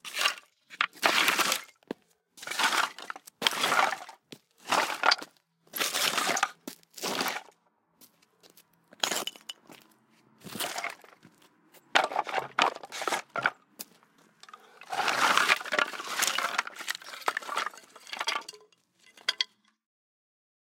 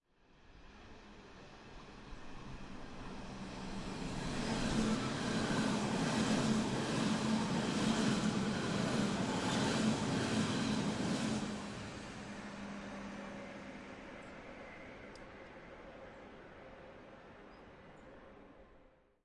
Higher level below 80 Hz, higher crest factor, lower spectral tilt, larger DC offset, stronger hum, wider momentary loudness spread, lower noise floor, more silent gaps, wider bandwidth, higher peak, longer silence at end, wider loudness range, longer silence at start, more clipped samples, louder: second, -84 dBFS vs -56 dBFS; first, 30 dB vs 18 dB; second, 0 dB/octave vs -5 dB/octave; neither; neither; about the same, 20 LU vs 22 LU; first, -70 dBFS vs -65 dBFS; neither; first, 17 kHz vs 11.5 kHz; first, -2 dBFS vs -20 dBFS; first, 1.3 s vs 0.45 s; second, 8 LU vs 19 LU; second, 0.05 s vs 0.45 s; neither; first, -29 LUFS vs -37 LUFS